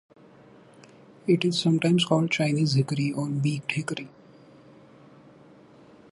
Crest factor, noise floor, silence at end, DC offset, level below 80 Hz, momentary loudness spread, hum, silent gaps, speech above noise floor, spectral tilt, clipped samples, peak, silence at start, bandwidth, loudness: 18 dB; -52 dBFS; 2.05 s; under 0.1%; -68 dBFS; 12 LU; none; none; 28 dB; -6 dB/octave; under 0.1%; -8 dBFS; 1.25 s; 11.5 kHz; -25 LUFS